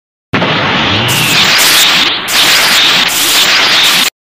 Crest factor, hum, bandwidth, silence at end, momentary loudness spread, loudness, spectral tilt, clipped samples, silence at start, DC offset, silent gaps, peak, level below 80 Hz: 8 dB; none; over 20 kHz; 0.15 s; 6 LU; -6 LUFS; -1 dB/octave; 0.3%; 0.35 s; 0.7%; none; 0 dBFS; -42 dBFS